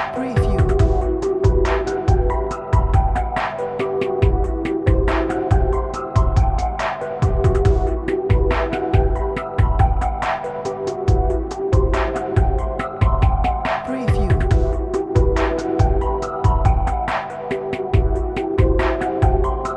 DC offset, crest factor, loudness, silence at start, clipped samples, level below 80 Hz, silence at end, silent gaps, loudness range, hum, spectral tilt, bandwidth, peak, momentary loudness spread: under 0.1%; 16 dB; -20 LUFS; 0 s; under 0.1%; -22 dBFS; 0 s; none; 1 LU; none; -8 dB/octave; 8.8 kHz; -2 dBFS; 5 LU